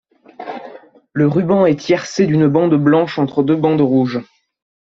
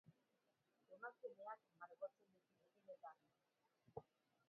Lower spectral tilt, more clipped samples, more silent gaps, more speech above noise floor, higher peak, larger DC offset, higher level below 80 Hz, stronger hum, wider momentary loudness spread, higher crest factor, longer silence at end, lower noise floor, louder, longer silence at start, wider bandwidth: first, -7.5 dB/octave vs -4.5 dB/octave; neither; neither; about the same, 25 dB vs 27 dB; first, -2 dBFS vs -38 dBFS; neither; first, -56 dBFS vs under -90 dBFS; neither; first, 17 LU vs 7 LU; second, 14 dB vs 22 dB; first, 0.7 s vs 0.45 s; second, -39 dBFS vs -86 dBFS; first, -15 LUFS vs -59 LUFS; first, 0.4 s vs 0.05 s; first, 7.6 kHz vs 4.8 kHz